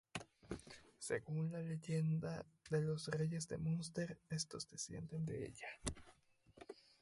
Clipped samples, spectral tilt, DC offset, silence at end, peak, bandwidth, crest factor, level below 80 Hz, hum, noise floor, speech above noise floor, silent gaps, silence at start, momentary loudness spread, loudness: under 0.1%; -5.5 dB/octave; under 0.1%; 0.3 s; -22 dBFS; 11.5 kHz; 22 dB; -66 dBFS; none; -66 dBFS; 23 dB; none; 0.15 s; 12 LU; -44 LUFS